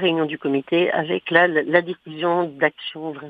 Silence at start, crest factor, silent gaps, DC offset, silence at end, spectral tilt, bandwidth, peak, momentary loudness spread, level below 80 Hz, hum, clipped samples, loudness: 0 s; 20 dB; none; under 0.1%; 0 s; -8 dB/octave; 4.9 kHz; 0 dBFS; 10 LU; -72 dBFS; none; under 0.1%; -20 LUFS